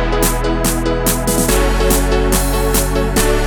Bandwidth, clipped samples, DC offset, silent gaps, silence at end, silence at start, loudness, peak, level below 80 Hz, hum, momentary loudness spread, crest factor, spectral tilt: 19.5 kHz; under 0.1%; under 0.1%; none; 0 s; 0 s; -15 LUFS; 0 dBFS; -18 dBFS; none; 2 LU; 14 dB; -4 dB/octave